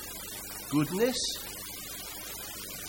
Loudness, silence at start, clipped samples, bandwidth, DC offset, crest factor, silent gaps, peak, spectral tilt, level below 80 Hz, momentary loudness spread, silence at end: -33 LUFS; 0 s; under 0.1%; 17 kHz; under 0.1%; 20 dB; none; -14 dBFS; -3.5 dB/octave; -56 dBFS; 10 LU; 0 s